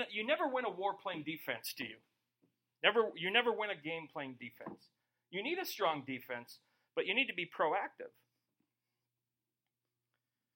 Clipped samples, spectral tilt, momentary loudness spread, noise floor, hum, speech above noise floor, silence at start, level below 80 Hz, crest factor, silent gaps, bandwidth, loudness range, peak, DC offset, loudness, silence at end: under 0.1%; -3.5 dB/octave; 15 LU; under -90 dBFS; none; over 52 dB; 0 s; -90 dBFS; 26 dB; none; 16.5 kHz; 5 LU; -12 dBFS; under 0.1%; -37 LUFS; 2.45 s